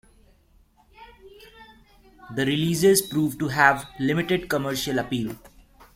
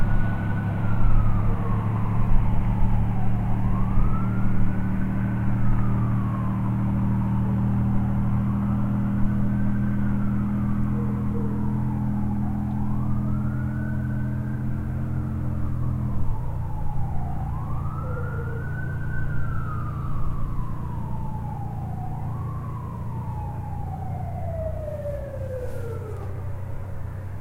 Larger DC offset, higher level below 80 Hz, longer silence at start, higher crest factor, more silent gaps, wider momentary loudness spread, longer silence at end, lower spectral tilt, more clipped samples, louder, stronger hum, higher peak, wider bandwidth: neither; second, -54 dBFS vs -30 dBFS; first, 1 s vs 0 s; about the same, 22 dB vs 18 dB; neither; about the same, 10 LU vs 8 LU; first, 0.5 s vs 0 s; second, -4.5 dB/octave vs -10 dB/octave; neither; first, -23 LUFS vs -27 LUFS; neither; first, -2 dBFS vs -6 dBFS; first, 16.5 kHz vs 3.3 kHz